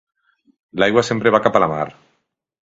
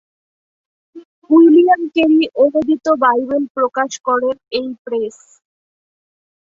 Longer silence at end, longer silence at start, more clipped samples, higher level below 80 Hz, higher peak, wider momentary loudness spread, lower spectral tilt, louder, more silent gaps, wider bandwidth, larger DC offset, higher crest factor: second, 0.8 s vs 1.4 s; second, 0.75 s vs 0.95 s; neither; first, -54 dBFS vs -60 dBFS; about the same, 0 dBFS vs -2 dBFS; about the same, 12 LU vs 13 LU; first, -5.5 dB/octave vs -4 dB/octave; second, -17 LUFS vs -14 LUFS; second, none vs 1.05-1.22 s, 3.50-3.55 s, 4.00-4.04 s, 4.79-4.85 s; about the same, 8 kHz vs 7.6 kHz; neither; first, 20 dB vs 14 dB